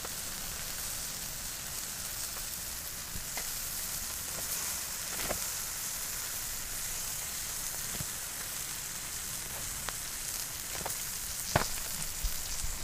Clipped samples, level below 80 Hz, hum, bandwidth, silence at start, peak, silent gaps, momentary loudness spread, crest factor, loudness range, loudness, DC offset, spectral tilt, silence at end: under 0.1%; -48 dBFS; none; 16 kHz; 0 s; -10 dBFS; none; 4 LU; 28 dB; 2 LU; -35 LUFS; under 0.1%; -1 dB/octave; 0 s